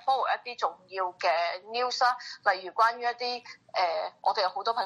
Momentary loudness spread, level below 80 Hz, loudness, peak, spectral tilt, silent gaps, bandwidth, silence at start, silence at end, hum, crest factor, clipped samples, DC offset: 8 LU; -80 dBFS; -29 LUFS; -10 dBFS; -0.5 dB/octave; none; 12 kHz; 0.05 s; 0 s; none; 18 dB; under 0.1%; under 0.1%